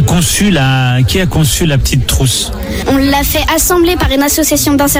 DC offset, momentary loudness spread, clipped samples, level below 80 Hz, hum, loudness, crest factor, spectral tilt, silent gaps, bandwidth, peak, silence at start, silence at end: under 0.1%; 2 LU; under 0.1%; -20 dBFS; none; -10 LUFS; 10 dB; -4 dB/octave; none; 17 kHz; 0 dBFS; 0 s; 0 s